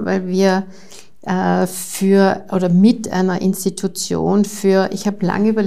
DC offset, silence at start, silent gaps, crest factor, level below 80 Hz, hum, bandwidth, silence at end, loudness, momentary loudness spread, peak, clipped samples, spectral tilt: 1%; 0 s; none; 14 dB; -54 dBFS; none; 15.5 kHz; 0 s; -17 LUFS; 8 LU; -2 dBFS; under 0.1%; -6 dB/octave